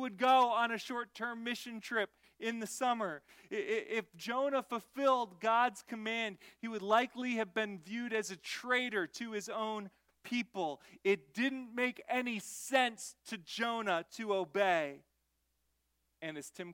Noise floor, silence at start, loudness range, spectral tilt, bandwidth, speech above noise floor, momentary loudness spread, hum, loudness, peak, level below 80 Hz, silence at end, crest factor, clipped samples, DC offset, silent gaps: -81 dBFS; 0 s; 4 LU; -3 dB/octave; 16.5 kHz; 45 dB; 11 LU; none; -36 LUFS; -16 dBFS; -84 dBFS; 0 s; 20 dB; under 0.1%; under 0.1%; none